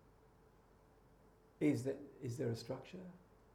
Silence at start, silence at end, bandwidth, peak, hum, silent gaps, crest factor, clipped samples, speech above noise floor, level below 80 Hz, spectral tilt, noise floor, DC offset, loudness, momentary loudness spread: 1.6 s; 0.35 s; 15.5 kHz; -24 dBFS; none; none; 20 dB; under 0.1%; 26 dB; -72 dBFS; -7 dB/octave; -67 dBFS; under 0.1%; -42 LUFS; 18 LU